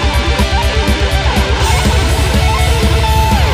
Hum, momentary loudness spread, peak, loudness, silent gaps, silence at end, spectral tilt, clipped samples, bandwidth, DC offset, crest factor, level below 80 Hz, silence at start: none; 2 LU; 0 dBFS; -12 LUFS; none; 0 s; -4.5 dB/octave; under 0.1%; 15.5 kHz; 0.2%; 10 dB; -14 dBFS; 0 s